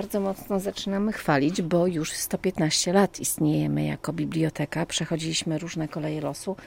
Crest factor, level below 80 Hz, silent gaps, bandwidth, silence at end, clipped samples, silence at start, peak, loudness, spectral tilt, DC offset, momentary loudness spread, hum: 18 dB; -54 dBFS; none; 16.5 kHz; 0 s; under 0.1%; 0 s; -8 dBFS; -26 LUFS; -4.5 dB/octave; under 0.1%; 7 LU; none